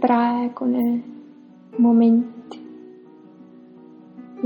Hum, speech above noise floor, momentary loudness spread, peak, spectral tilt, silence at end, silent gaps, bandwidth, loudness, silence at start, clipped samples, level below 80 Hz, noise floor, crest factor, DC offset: none; 28 dB; 25 LU; -4 dBFS; -9 dB/octave; 0 s; none; 8.2 kHz; -19 LUFS; 0 s; under 0.1%; -74 dBFS; -46 dBFS; 18 dB; under 0.1%